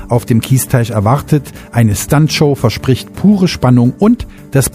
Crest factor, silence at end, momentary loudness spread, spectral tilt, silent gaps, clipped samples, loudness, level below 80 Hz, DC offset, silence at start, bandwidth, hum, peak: 12 dB; 0.05 s; 6 LU; -6 dB/octave; none; under 0.1%; -12 LUFS; -34 dBFS; under 0.1%; 0 s; 15.5 kHz; none; 0 dBFS